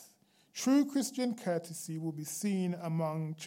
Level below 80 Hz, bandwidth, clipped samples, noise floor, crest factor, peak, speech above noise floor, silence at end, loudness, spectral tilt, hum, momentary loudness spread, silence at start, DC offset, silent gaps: under -90 dBFS; 16.5 kHz; under 0.1%; -66 dBFS; 16 dB; -18 dBFS; 33 dB; 0 s; -34 LUFS; -5.5 dB/octave; none; 10 LU; 0 s; under 0.1%; none